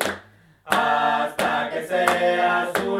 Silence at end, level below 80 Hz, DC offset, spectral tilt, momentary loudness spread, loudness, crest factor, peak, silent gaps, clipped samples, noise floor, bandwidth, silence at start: 0 s; -62 dBFS; under 0.1%; -3.5 dB/octave; 6 LU; -21 LUFS; 22 dB; 0 dBFS; none; under 0.1%; -50 dBFS; 16.5 kHz; 0 s